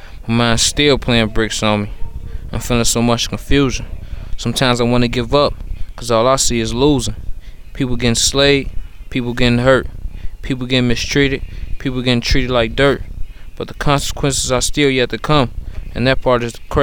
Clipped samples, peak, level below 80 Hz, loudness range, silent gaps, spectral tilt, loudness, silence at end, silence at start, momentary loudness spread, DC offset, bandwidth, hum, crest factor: under 0.1%; 0 dBFS; -26 dBFS; 2 LU; none; -4 dB/octave; -15 LUFS; 0 s; 0 s; 18 LU; under 0.1%; 19 kHz; none; 14 dB